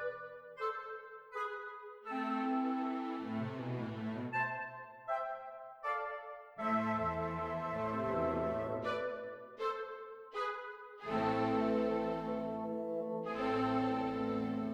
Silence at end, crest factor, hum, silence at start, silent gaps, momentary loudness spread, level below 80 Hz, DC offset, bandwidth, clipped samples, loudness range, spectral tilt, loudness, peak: 0 s; 16 dB; none; 0 s; none; 13 LU; -64 dBFS; under 0.1%; 9.2 kHz; under 0.1%; 4 LU; -7.5 dB/octave; -38 LUFS; -22 dBFS